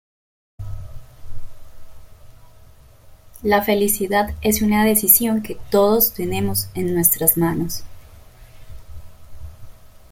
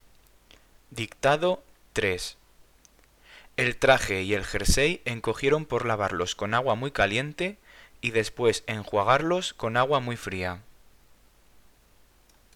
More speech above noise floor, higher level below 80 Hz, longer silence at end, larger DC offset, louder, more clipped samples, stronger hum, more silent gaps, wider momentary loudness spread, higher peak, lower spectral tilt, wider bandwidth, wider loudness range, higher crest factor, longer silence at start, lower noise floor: second, 28 dB vs 33 dB; about the same, -40 dBFS vs -42 dBFS; second, 0.15 s vs 1.85 s; neither; first, -17 LUFS vs -26 LUFS; neither; neither; neither; first, 18 LU vs 10 LU; about the same, 0 dBFS vs -2 dBFS; about the same, -4 dB/octave vs -4 dB/octave; about the same, 17 kHz vs 18.5 kHz; first, 8 LU vs 5 LU; about the same, 22 dB vs 26 dB; second, 0.6 s vs 0.9 s; second, -46 dBFS vs -59 dBFS